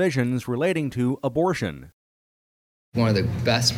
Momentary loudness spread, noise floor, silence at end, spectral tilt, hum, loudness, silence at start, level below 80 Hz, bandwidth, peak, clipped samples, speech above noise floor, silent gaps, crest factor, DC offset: 8 LU; under -90 dBFS; 0 s; -5.5 dB/octave; none; -24 LUFS; 0 s; -50 dBFS; 16 kHz; -6 dBFS; under 0.1%; over 67 dB; 1.93-2.92 s; 18 dB; under 0.1%